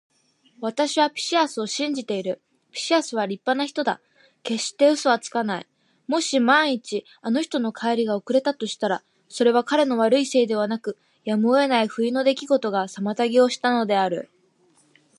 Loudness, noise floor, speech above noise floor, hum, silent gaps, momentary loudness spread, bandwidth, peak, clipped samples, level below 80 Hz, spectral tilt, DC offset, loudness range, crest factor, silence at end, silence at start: -22 LUFS; -61 dBFS; 39 dB; none; none; 11 LU; 11.5 kHz; -4 dBFS; under 0.1%; -80 dBFS; -3.5 dB/octave; under 0.1%; 3 LU; 18 dB; 0.95 s; 0.6 s